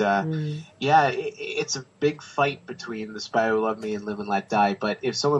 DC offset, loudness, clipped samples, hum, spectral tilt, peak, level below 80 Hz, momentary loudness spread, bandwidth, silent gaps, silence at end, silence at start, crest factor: under 0.1%; -25 LUFS; under 0.1%; none; -4.5 dB/octave; -6 dBFS; -68 dBFS; 12 LU; 8.2 kHz; none; 0 s; 0 s; 18 dB